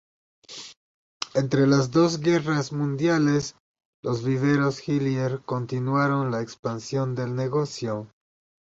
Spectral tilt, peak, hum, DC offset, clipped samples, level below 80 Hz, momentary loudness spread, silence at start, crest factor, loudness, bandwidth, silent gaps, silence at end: -6.5 dB/octave; -6 dBFS; none; under 0.1%; under 0.1%; -62 dBFS; 14 LU; 0.5 s; 18 dB; -25 LUFS; 8 kHz; 0.77-1.20 s, 3.60-3.74 s, 3.85-4.03 s, 6.59-6.63 s; 0.6 s